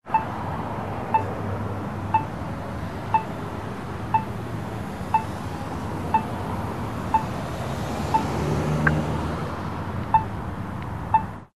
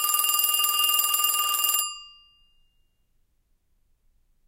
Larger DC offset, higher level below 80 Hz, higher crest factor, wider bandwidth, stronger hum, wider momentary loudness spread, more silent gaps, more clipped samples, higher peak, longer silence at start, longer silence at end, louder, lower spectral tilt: first, 0.6% vs under 0.1%; first, -42 dBFS vs -66 dBFS; about the same, 22 dB vs 20 dB; second, 13 kHz vs 17.5 kHz; neither; first, 9 LU vs 6 LU; neither; neither; about the same, -4 dBFS vs -6 dBFS; about the same, 0 s vs 0 s; second, 0.05 s vs 2.4 s; second, -27 LUFS vs -21 LUFS; first, -7 dB/octave vs 5 dB/octave